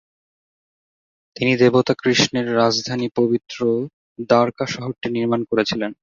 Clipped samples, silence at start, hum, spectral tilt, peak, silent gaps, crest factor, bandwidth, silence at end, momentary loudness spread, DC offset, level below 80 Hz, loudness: under 0.1%; 1.4 s; none; -5 dB/octave; -2 dBFS; 3.93-4.16 s; 18 dB; 7.6 kHz; 0.1 s; 9 LU; under 0.1%; -58 dBFS; -19 LUFS